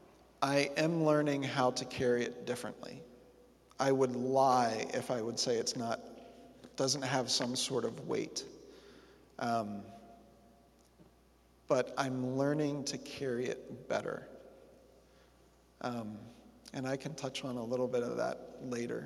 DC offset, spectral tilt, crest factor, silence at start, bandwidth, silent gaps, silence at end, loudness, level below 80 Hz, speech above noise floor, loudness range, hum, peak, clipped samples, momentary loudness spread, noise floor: under 0.1%; -4.5 dB/octave; 22 dB; 0.4 s; 14.5 kHz; none; 0 s; -35 LUFS; -70 dBFS; 31 dB; 10 LU; none; -14 dBFS; under 0.1%; 20 LU; -66 dBFS